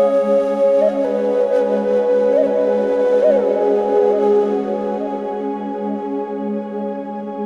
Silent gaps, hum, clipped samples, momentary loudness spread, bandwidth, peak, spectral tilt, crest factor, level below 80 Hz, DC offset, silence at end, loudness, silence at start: none; none; under 0.1%; 9 LU; 7.4 kHz; -4 dBFS; -7.5 dB/octave; 12 dB; -60 dBFS; under 0.1%; 0 s; -17 LUFS; 0 s